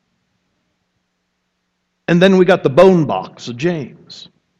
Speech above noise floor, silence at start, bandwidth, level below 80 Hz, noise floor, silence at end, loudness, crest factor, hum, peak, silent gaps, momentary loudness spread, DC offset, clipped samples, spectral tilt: 57 dB; 2.1 s; 9.2 kHz; -52 dBFS; -70 dBFS; 0.4 s; -13 LUFS; 16 dB; none; 0 dBFS; none; 24 LU; under 0.1%; under 0.1%; -7 dB/octave